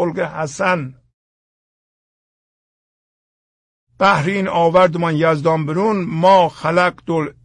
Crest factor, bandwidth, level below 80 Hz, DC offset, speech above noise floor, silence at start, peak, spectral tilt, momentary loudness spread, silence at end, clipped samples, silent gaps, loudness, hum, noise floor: 16 dB; 10.5 kHz; -56 dBFS; under 0.1%; over 74 dB; 0 s; -2 dBFS; -6 dB/octave; 9 LU; 0.15 s; under 0.1%; 1.14-3.87 s; -16 LUFS; none; under -90 dBFS